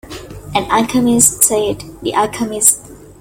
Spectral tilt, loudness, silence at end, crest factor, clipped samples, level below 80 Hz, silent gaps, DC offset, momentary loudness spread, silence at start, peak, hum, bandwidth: -3 dB/octave; -13 LUFS; 0.1 s; 16 dB; 0.1%; -42 dBFS; none; under 0.1%; 13 LU; 0.05 s; 0 dBFS; none; over 20 kHz